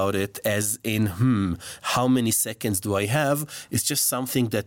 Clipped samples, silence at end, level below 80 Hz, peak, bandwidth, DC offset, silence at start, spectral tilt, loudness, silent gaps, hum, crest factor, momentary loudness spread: under 0.1%; 0 s; -58 dBFS; -10 dBFS; 17 kHz; under 0.1%; 0 s; -4 dB/octave; -24 LUFS; none; none; 14 dB; 5 LU